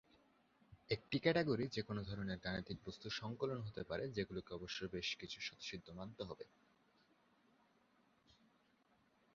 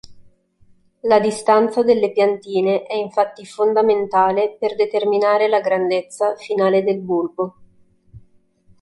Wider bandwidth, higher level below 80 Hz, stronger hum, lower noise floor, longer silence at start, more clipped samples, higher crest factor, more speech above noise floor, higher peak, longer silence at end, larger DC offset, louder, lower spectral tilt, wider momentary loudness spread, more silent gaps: second, 7.4 kHz vs 11.5 kHz; second, -68 dBFS vs -60 dBFS; neither; first, -76 dBFS vs -54 dBFS; first, 0.7 s vs 0.1 s; neither; first, 26 dB vs 16 dB; second, 32 dB vs 36 dB; second, -20 dBFS vs -2 dBFS; first, 2.9 s vs 0.65 s; neither; second, -44 LUFS vs -18 LUFS; second, -4 dB/octave vs -5.5 dB/octave; first, 13 LU vs 7 LU; neither